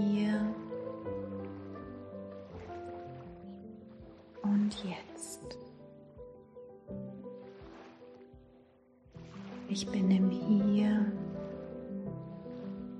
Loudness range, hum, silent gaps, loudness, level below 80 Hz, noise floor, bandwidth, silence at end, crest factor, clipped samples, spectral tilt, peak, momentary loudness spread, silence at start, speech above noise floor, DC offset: 17 LU; none; none; -35 LUFS; -64 dBFS; -63 dBFS; 9.4 kHz; 0 s; 18 dB; under 0.1%; -6.5 dB/octave; -18 dBFS; 24 LU; 0 s; 32 dB; under 0.1%